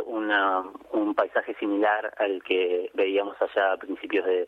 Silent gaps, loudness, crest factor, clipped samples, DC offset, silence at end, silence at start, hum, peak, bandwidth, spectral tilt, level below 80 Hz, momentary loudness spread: none; -26 LUFS; 16 dB; under 0.1%; under 0.1%; 0 s; 0 s; none; -8 dBFS; 4.8 kHz; -5.5 dB/octave; -72 dBFS; 5 LU